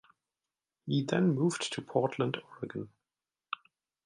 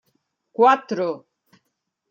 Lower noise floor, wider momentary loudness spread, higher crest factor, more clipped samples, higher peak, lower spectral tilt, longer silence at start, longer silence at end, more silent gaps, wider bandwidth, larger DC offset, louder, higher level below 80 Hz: first, under -90 dBFS vs -77 dBFS; second, 15 LU vs 19 LU; about the same, 22 dB vs 20 dB; neither; second, -12 dBFS vs -4 dBFS; about the same, -6 dB/octave vs -5.5 dB/octave; first, 0.85 s vs 0.6 s; second, 0.5 s vs 0.95 s; neither; first, 11 kHz vs 7.2 kHz; neither; second, -33 LUFS vs -20 LUFS; about the same, -74 dBFS vs -78 dBFS